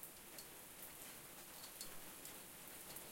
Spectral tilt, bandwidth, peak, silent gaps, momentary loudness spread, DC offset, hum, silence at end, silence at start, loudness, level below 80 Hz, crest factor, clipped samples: -1.5 dB/octave; 17 kHz; -32 dBFS; none; 3 LU; under 0.1%; none; 0 s; 0 s; -53 LUFS; -74 dBFS; 24 dB; under 0.1%